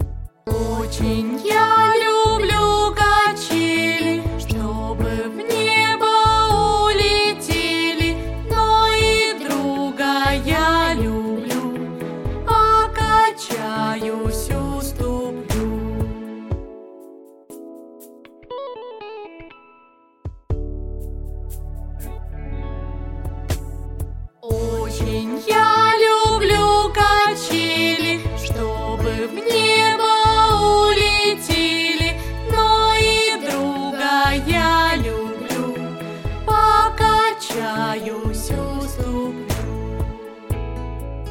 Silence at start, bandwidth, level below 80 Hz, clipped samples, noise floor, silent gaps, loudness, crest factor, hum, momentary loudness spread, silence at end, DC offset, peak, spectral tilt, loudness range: 0 s; 17 kHz; -30 dBFS; under 0.1%; -53 dBFS; none; -18 LUFS; 18 dB; none; 17 LU; 0 s; under 0.1%; -2 dBFS; -4 dB/octave; 16 LU